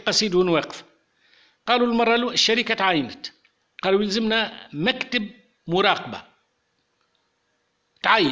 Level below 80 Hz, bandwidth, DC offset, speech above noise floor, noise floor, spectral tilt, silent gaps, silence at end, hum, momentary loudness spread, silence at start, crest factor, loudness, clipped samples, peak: -60 dBFS; 8 kHz; under 0.1%; 49 dB; -71 dBFS; -3.5 dB/octave; none; 0 s; none; 18 LU; 0.05 s; 20 dB; -21 LUFS; under 0.1%; -4 dBFS